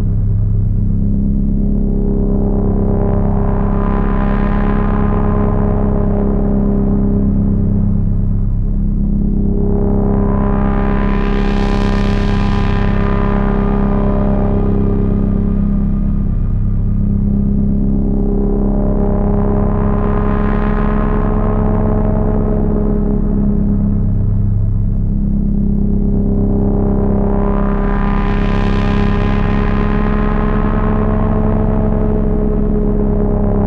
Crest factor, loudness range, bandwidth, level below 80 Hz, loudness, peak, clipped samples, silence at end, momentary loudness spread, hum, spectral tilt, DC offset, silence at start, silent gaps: 8 dB; 1 LU; 4.9 kHz; -16 dBFS; -16 LUFS; -4 dBFS; under 0.1%; 0 s; 1 LU; 50 Hz at -25 dBFS; -10 dB/octave; under 0.1%; 0 s; none